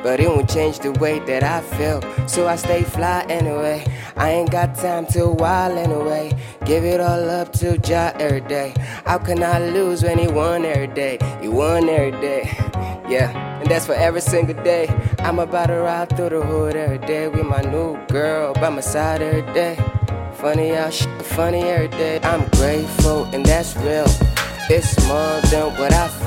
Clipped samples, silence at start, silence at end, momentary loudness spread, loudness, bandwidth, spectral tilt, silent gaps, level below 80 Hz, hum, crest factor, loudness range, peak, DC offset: under 0.1%; 0 s; 0 s; 5 LU; -19 LUFS; 17 kHz; -5.5 dB/octave; none; -30 dBFS; none; 16 dB; 3 LU; -2 dBFS; under 0.1%